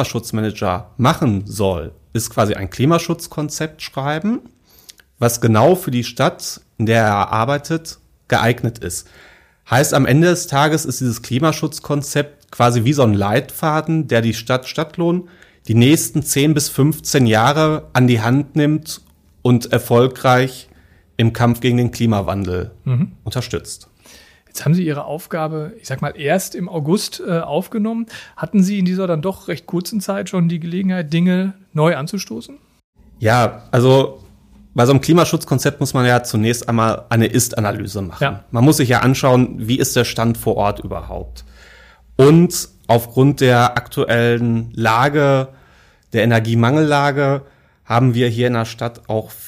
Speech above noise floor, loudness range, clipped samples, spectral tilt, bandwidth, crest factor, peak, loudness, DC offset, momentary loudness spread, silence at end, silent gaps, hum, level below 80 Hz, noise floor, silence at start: 34 dB; 5 LU; under 0.1%; -5.5 dB/octave; 15.5 kHz; 16 dB; -2 dBFS; -17 LUFS; under 0.1%; 11 LU; 0 s; 32.84-32.93 s; none; -46 dBFS; -50 dBFS; 0 s